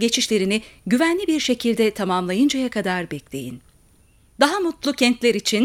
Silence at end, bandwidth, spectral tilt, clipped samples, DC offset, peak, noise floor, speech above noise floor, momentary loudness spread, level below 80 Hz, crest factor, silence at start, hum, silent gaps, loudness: 0 s; 17 kHz; -3.5 dB/octave; under 0.1%; under 0.1%; 0 dBFS; -55 dBFS; 35 dB; 9 LU; -56 dBFS; 20 dB; 0 s; none; none; -20 LUFS